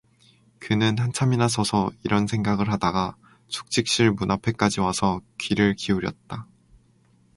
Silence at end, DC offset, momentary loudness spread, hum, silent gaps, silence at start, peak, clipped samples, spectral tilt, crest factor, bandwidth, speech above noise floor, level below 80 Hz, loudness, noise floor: 0.9 s; under 0.1%; 11 LU; none; none; 0.6 s; -4 dBFS; under 0.1%; -5 dB/octave; 20 dB; 11.5 kHz; 37 dB; -50 dBFS; -23 LUFS; -60 dBFS